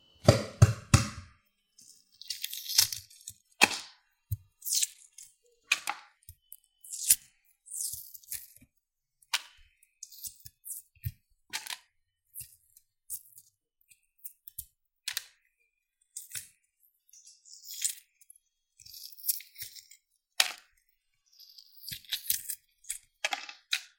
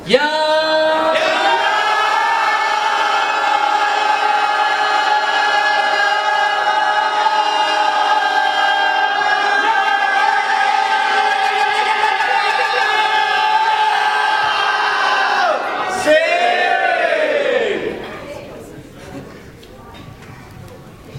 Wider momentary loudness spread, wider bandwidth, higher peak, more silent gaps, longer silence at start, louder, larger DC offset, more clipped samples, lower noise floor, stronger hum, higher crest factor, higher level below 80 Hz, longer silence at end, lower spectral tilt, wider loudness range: first, 24 LU vs 3 LU; first, 17 kHz vs 15 kHz; second, -4 dBFS vs 0 dBFS; neither; first, 0.25 s vs 0 s; second, -31 LUFS vs -15 LUFS; neither; neither; first, -80 dBFS vs -37 dBFS; neither; first, 32 dB vs 16 dB; about the same, -54 dBFS vs -54 dBFS; first, 0.15 s vs 0 s; about the same, -3 dB/octave vs -2 dB/octave; first, 14 LU vs 4 LU